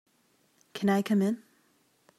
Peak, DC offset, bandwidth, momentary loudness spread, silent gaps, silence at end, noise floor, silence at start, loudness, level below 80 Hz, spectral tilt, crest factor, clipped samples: -14 dBFS; under 0.1%; 14 kHz; 14 LU; none; 0.8 s; -69 dBFS; 0.75 s; -28 LUFS; -78 dBFS; -6.5 dB/octave; 18 dB; under 0.1%